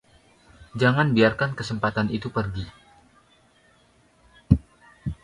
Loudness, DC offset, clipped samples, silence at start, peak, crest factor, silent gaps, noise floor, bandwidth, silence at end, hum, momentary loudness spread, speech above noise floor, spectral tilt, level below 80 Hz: -24 LUFS; under 0.1%; under 0.1%; 0.6 s; -2 dBFS; 24 dB; none; -60 dBFS; 11.5 kHz; 0.1 s; none; 16 LU; 37 dB; -7 dB/octave; -42 dBFS